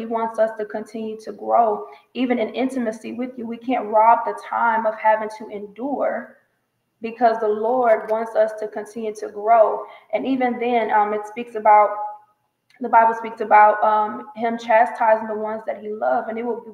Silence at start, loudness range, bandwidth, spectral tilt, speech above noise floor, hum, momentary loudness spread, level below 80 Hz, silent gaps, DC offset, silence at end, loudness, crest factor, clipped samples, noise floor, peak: 0 s; 5 LU; 11.5 kHz; -5.5 dB/octave; 51 dB; none; 15 LU; -74 dBFS; none; under 0.1%; 0 s; -20 LUFS; 18 dB; under 0.1%; -71 dBFS; -2 dBFS